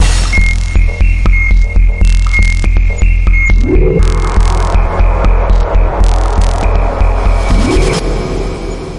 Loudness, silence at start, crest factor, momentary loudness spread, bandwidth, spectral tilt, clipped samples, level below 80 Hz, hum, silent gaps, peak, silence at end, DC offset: -12 LUFS; 0 s; 8 dB; 3 LU; 11 kHz; -5.5 dB/octave; under 0.1%; -10 dBFS; none; none; 0 dBFS; 0 s; under 0.1%